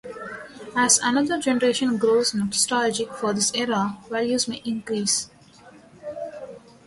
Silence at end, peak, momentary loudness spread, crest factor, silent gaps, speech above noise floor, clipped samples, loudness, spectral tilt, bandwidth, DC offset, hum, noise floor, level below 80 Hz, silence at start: 0.3 s; -4 dBFS; 18 LU; 20 dB; none; 27 dB; under 0.1%; -22 LUFS; -2.5 dB/octave; 12 kHz; under 0.1%; none; -49 dBFS; -62 dBFS; 0.05 s